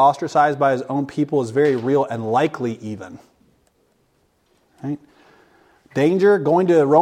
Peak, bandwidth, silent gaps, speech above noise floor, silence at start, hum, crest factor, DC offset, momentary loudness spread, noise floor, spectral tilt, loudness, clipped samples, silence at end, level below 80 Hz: -2 dBFS; 10.5 kHz; none; 45 dB; 0 s; none; 16 dB; under 0.1%; 16 LU; -63 dBFS; -7 dB/octave; -19 LUFS; under 0.1%; 0 s; -66 dBFS